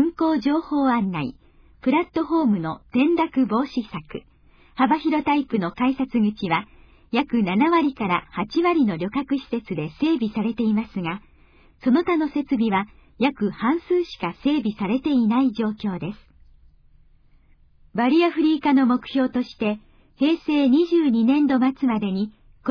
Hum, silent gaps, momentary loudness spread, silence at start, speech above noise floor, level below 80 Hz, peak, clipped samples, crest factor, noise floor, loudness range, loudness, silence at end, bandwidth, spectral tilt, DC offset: none; none; 10 LU; 0 s; 33 dB; -54 dBFS; -8 dBFS; under 0.1%; 16 dB; -54 dBFS; 4 LU; -22 LUFS; 0 s; 5.4 kHz; -8 dB/octave; under 0.1%